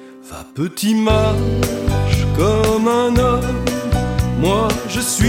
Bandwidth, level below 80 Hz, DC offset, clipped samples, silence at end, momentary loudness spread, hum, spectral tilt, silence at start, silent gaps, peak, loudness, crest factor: 17 kHz; -26 dBFS; under 0.1%; under 0.1%; 0 s; 6 LU; none; -5.5 dB/octave; 0 s; none; -2 dBFS; -17 LUFS; 14 dB